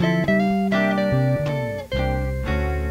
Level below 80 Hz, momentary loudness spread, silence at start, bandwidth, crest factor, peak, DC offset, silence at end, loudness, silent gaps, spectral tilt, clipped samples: -30 dBFS; 6 LU; 0 s; 16 kHz; 14 dB; -8 dBFS; under 0.1%; 0 s; -22 LUFS; none; -7.5 dB/octave; under 0.1%